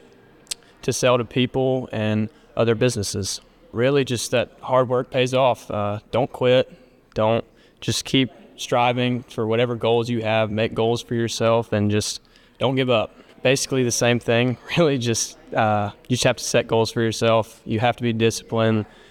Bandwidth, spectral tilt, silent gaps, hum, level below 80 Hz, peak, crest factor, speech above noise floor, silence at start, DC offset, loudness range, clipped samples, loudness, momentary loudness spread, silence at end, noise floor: 17 kHz; -4.5 dB/octave; none; none; -54 dBFS; -4 dBFS; 18 dB; 30 dB; 0.85 s; under 0.1%; 2 LU; under 0.1%; -21 LUFS; 7 LU; 0.25 s; -51 dBFS